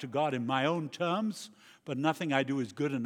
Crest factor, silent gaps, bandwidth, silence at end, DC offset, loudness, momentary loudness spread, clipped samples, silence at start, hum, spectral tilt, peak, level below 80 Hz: 20 dB; none; 17 kHz; 0 s; under 0.1%; -32 LUFS; 12 LU; under 0.1%; 0 s; none; -5.5 dB/octave; -12 dBFS; -86 dBFS